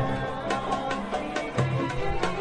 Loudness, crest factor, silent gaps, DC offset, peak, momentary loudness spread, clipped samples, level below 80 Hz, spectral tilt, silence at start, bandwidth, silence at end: -29 LUFS; 16 dB; none; under 0.1%; -10 dBFS; 3 LU; under 0.1%; -42 dBFS; -6 dB/octave; 0 s; 10.5 kHz; 0 s